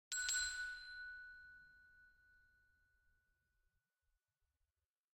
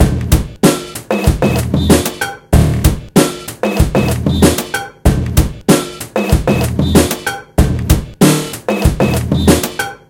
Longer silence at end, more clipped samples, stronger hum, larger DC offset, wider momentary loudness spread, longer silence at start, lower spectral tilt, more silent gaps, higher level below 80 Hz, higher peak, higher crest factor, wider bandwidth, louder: first, 2.8 s vs 0.15 s; second, under 0.1% vs 0.4%; neither; neither; first, 22 LU vs 7 LU; about the same, 0.1 s vs 0 s; second, 4 dB/octave vs -5.5 dB/octave; neither; second, -74 dBFS vs -20 dBFS; second, -24 dBFS vs 0 dBFS; first, 28 dB vs 12 dB; about the same, 16 kHz vs 17.5 kHz; second, -43 LUFS vs -14 LUFS